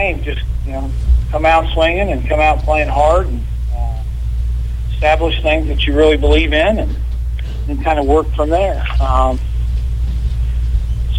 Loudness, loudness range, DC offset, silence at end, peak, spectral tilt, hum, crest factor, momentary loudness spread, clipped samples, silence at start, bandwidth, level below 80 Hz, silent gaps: -16 LUFS; 2 LU; under 0.1%; 0 s; -2 dBFS; -6.5 dB/octave; none; 12 dB; 10 LU; under 0.1%; 0 s; 9.2 kHz; -16 dBFS; none